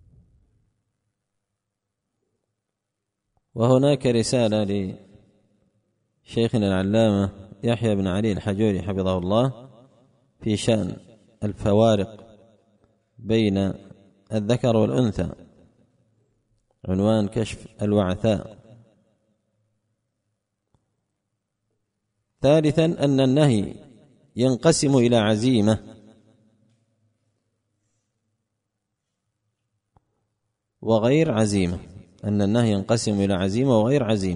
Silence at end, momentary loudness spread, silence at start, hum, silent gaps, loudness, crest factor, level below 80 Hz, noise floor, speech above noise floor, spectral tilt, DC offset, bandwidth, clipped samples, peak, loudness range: 0 s; 13 LU; 3.55 s; none; none; -22 LUFS; 20 dB; -52 dBFS; -82 dBFS; 61 dB; -6.5 dB/octave; under 0.1%; 10.5 kHz; under 0.1%; -4 dBFS; 6 LU